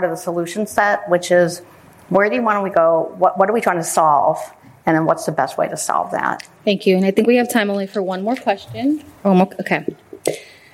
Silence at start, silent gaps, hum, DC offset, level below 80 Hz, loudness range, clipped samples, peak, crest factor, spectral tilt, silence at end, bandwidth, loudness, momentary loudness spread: 0 s; none; none; under 0.1%; -62 dBFS; 2 LU; under 0.1%; -2 dBFS; 16 dB; -5 dB/octave; 0.3 s; 16 kHz; -18 LUFS; 8 LU